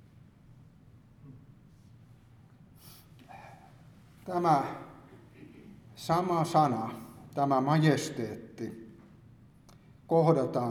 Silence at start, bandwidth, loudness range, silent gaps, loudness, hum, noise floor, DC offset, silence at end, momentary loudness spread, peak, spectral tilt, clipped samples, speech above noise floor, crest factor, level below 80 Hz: 1.25 s; 17.5 kHz; 6 LU; none; -29 LUFS; none; -57 dBFS; under 0.1%; 0 s; 27 LU; -12 dBFS; -6.5 dB/octave; under 0.1%; 29 dB; 22 dB; -66 dBFS